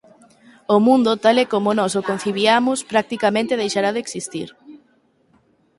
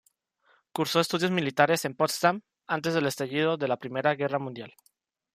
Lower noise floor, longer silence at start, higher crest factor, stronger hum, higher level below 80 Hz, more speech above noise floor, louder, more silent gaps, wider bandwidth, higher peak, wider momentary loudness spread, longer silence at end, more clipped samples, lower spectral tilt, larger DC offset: second, -60 dBFS vs -67 dBFS; about the same, 0.7 s vs 0.75 s; about the same, 18 dB vs 20 dB; neither; first, -64 dBFS vs -74 dBFS; about the same, 42 dB vs 40 dB; first, -18 LUFS vs -27 LUFS; neither; second, 11.5 kHz vs 15.5 kHz; first, -2 dBFS vs -8 dBFS; about the same, 13 LU vs 13 LU; first, 1 s vs 0.65 s; neither; about the same, -4 dB/octave vs -4.5 dB/octave; neither